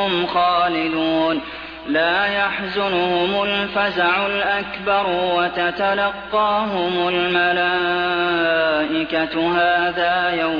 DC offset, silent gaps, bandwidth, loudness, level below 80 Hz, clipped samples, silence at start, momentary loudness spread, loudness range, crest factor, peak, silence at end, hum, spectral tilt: under 0.1%; none; 5.4 kHz; -19 LUFS; -50 dBFS; under 0.1%; 0 s; 4 LU; 1 LU; 14 dB; -6 dBFS; 0 s; none; -6.5 dB/octave